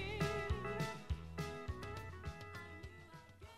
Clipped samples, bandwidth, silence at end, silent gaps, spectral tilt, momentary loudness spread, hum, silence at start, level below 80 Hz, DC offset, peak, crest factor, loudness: under 0.1%; 15.5 kHz; 0 s; none; -5.5 dB/octave; 15 LU; none; 0 s; -52 dBFS; under 0.1%; -24 dBFS; 20 dB; -45 LUFS